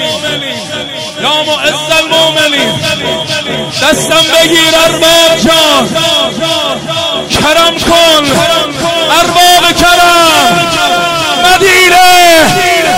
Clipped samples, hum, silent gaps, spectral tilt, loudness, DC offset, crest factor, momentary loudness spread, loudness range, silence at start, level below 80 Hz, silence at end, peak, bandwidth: 0.2%; none; none; -2 dB/octave; -6 LUFS; under 0.1%; 8 dB; 9 LU; 4 LU; 0 s; -34 dBFS; 0 s; 0 dBFS; 16.5 kHz